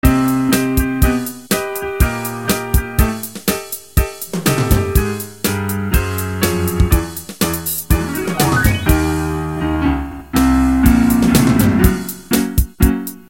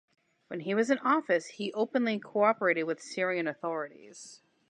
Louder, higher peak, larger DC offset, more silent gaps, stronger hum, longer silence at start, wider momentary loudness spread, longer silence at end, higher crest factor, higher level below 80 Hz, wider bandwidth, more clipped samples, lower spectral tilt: first, -16 LUFS vs -30 LUFS; first, 0 dBFS vs -12 dBFS; first, 0.4% vs under 0.1%; neither; neither; second, 0.05 s vs 0.5 s; second, 8 LU vs 16 LU; second, 0.1 s vs 0.35 s; about the same, 16 dB vs 18 dB; first, -22 dBFS vs -88 dBFS; first, 17.5 kHz vs 10.5 kHz; neither; about the same, -5.5 dB/octave vs -5 dB/octave